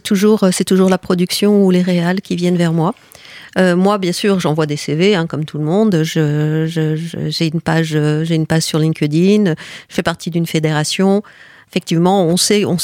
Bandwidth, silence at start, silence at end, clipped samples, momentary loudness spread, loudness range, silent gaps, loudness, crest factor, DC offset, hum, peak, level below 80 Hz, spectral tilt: 16.5 kHz; 0.05 s; 0 s; under 0.1%; 8 LU; 2 LU; none; -15 LUFS; 12 dB; under 0.1%; none; -2 dBFS; -54 dBFS; -5.5 dB/octave